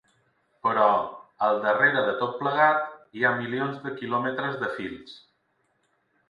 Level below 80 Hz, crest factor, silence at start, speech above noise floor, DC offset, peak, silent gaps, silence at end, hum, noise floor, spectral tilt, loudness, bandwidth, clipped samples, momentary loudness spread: -70 dBFS; 20 dB; 0.65 s; 47 dB; under 0.1%; -8 dBFS; none; 1.1 s; none; -71 dBFS; -7 dB/octave; -25 LUFS; 6.8 kHz; under 0.1%; 14 LU